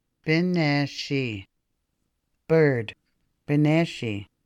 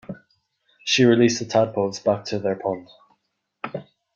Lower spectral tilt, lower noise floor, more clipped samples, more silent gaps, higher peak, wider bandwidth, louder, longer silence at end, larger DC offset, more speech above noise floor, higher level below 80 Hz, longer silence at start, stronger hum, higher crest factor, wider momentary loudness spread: first, -7 dB/octave vs -4.5 dB/octave; about the same, -76 dBFS vs -73 dBFS; neither; neither; second, -8 dBFS vs -4 dBFS; first, 9.4 kHz vs 7.6 kHz; second, -24 LUFS vs -21 LUFS; second, 0.2 s vs 0.35 s; neither; about the same, 53 dB vs 53 dB; about the same, -64 dBFS vs -64 dBFS; first, 0.25 s vs 0.1 s; neither; about the same, 16 dB vs 18 dB; second, 11 LU vs 20 LU